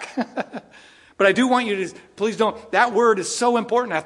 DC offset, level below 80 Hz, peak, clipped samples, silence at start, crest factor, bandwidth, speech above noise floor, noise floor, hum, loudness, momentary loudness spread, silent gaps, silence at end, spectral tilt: under 0.1%; -66 dBFS; -2 dBFS; under 0.1%; 0 s; 18 dB; 11.5 kHz; 29 dB; -49 dBFS; none; -20 LUFS; 13 LU; none; 0 s; -3.5 dB/octave